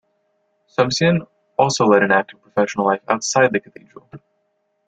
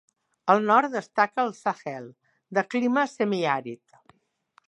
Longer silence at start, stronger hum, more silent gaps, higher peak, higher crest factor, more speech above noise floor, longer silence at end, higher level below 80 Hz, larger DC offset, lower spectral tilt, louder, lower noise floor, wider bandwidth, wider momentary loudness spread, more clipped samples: first, 0.8 s vs 0.45 s; neither; neither; first, 0 dBFS vs -4 dBFS; about the same, 20 dB vs 22 dB; first, 51 dB vs 40 dB; second, 0.7 s vs 0.95 s; first, -58 dBFS vs -80 dBFS; neither; about the same, -4.5 dB/octave vs -5.5 dB/octave; first, -18 LUFS vs -25 LUFS; first, -69 dBFS vs -64 dBFS; second, 9.2 kHz vs 10.5 kHz; second, 10 LU vs 15 LU; neither